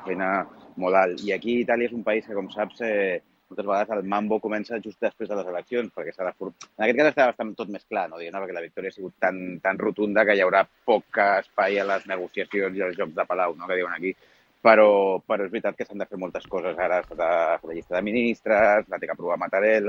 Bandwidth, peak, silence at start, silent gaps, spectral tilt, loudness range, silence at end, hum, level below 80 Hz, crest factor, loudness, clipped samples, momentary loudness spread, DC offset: 7.2 kHz; -2 dBFS; 0 s; none; -6 dB/octave; 5 LU; 0 s; none; -64 dBFS; 24 dB; -24 LUFS; under 0.1%; 13 LU; under 0.1%